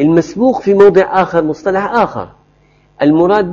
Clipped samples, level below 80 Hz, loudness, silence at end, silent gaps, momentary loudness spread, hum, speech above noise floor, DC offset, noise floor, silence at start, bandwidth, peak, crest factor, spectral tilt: 0.1%; -46 dBFS; -11 LUFS; 0 s; none; 9 LU; none; 40 dB; under 0.1%; -50 dBFS; 0 s; 7.4 kHz; 0 dBFS; 12 dB; -7.5 dB/octave